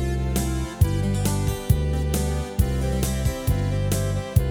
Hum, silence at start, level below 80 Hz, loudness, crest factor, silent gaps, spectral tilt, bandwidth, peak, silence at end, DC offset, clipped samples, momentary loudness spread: none; 0 s; -28 dBFS; -24 LUFS; 18 dB; none; -6 dB/octave; over 20 kHz; -6 dBFS; 0 s; under 0.1%; under 0.1%; 3 LU